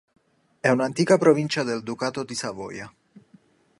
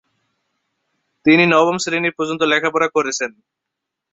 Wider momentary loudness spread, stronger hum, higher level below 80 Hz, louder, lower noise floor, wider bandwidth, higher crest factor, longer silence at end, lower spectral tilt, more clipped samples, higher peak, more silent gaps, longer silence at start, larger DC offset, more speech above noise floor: first, 17 LU vs 10 LU; neither; about the same, -66 dBFS vs -64 dBFS; second, -23 LUFS vs -16 LUFS; second, -57 dBFS vs -81 dBFS; first, 11.5 kHz vs 8.2 kHz; about the same, 20 dB vs 18 dB; about the same, 0.9 s vs 0.85 s; about the same, -5 dB/octave vs -4 dB/octave; neither; about the same, -4 dBFS vs -2 dBFS; neither; second, 0.65 s vs 1.25 s; neither; second, 35 dB vs 64 dB